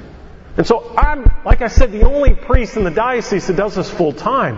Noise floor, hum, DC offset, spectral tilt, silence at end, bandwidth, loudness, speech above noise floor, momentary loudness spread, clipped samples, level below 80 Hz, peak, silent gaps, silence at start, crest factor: -36 dBFS; none; under 0.1%; -6.5 dB/octave; 0 s; 7.4 kHz; -16 LUFS; 23 dB; 3 LU; 0.3%; -16 dBFS; 0 dBFS; none; 0 s; 12 dB